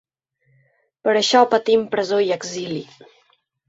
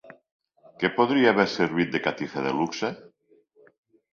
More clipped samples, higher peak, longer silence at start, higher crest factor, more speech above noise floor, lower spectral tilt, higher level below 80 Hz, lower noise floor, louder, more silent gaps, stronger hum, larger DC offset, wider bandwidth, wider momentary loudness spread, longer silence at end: neither; about the same, -2 dBFS vs -4 dBFS; first, 1.05 s vs 0.05 s; about the same, 20 dB vs 22 dB; first, 47 dB vs 38 dB; second, -3.5 dB/octave vs -5.5 dB/octave; about the same, -66 dBFS vs -66 dBFS; first, -66 dBFS vs -62 dBFS; first, -19 LUFS vs -24 LUFS; second, none vs 0.32-0.39 s; neither; neither; about the same, 7.8 kHz vs 7.2 kHz; about the same, 13 LU vs 11 LU; second, 0.85 s vs 1.1 s